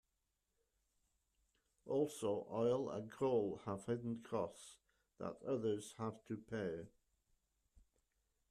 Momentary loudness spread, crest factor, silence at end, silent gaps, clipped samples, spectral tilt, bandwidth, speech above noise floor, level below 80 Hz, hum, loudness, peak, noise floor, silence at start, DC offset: 12 LU; 18 dB; 1.6 s; none; under 0.1%; -6.5 dB/octave; 13.5 kHz; 45 dB; -78 dBFS; none; -43 LUFS; -26 dBFS; -87 dBFS; 1.85 s; under 0.1%